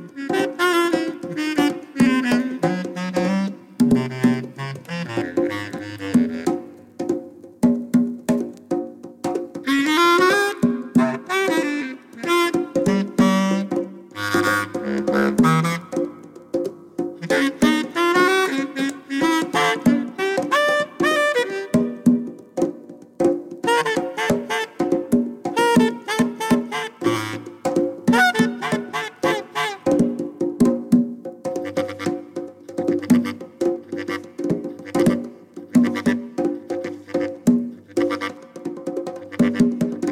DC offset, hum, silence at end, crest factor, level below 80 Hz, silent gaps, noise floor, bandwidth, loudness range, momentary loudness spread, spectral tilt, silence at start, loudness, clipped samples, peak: under 0.1%; none; 0 s; 16 dB; -56 dBFS; none; -40 dBFS; 16 kHz; 4 LU; 11 LU; -5 dB/octave; 0 s; -21 LUFS; under 0.1%; -4 dBFS